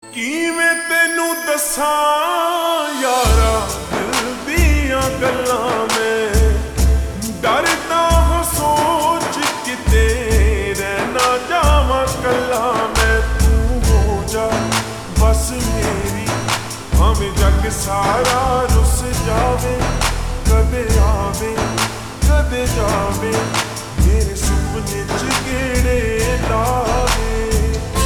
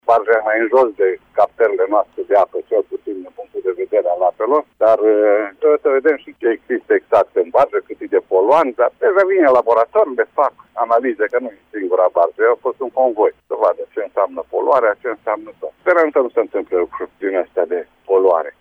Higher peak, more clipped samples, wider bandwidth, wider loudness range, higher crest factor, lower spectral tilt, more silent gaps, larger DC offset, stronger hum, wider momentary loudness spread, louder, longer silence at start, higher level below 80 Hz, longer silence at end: about the same, -2 dBFS vs -2 dBFS; neither; first, over 20 kHz vs 5.8 kHz; about the same, 2 LU vs 3 LU; about the same, 14 dB vs 14 dB; second, -4.5 dB/octave vs -6.5 dB/octave; neither; neither; neither; second, 5 LU vs 10 LU; about the same, -17 LUFS vs -16 LUFS; about the same, 0.05 s vs 0.05 s; first, -20 dBFS vs -62 dBFS; about the same, 0 s vs 0.1 s